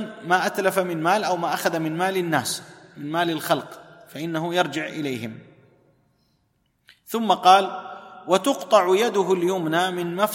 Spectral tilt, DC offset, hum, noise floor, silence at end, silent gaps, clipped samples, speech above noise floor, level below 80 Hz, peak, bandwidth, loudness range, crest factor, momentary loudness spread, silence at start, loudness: -4 dB/octave; under 0.1%; none; -69 dBFS; 0 s; none; under 0.1%; 47 dB; -72 dBFS; -4 dBFS; 16.5 kHz; 9 LU; 20 dB; 14 LU; 0 s; -22 LUFS